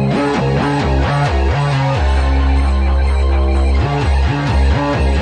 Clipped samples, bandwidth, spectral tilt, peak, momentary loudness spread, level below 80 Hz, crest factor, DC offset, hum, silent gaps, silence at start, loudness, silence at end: under 0.1%; 9 kHz; -7 dB/octave; -4 dBFS; 1 LU; -16 dBFS; 10 dB; under 0.1%; none; none; 0 s; -15 LUFS; 0 s